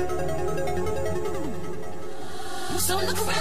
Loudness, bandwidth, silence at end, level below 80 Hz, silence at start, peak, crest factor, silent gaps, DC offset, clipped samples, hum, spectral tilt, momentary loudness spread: -29 LUFS; 15.5 kHz; 0 s; -44 dBFS; 0 s; -10 dBFS; 16 dB; none; 5%; under 0.1%; none; -4 dB/octave; 12 LU